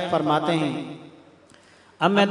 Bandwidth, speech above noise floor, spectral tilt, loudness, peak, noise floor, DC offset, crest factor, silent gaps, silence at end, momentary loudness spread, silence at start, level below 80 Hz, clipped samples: 10.5 kHz; 32 dB; -6 dB/octave; -23 LUFS; -4 dBFS; -53 dBFS; under 0.1%; 20 dB; none; 0 s; 16 LU; 0 s; -70 dBFS; under 0.1%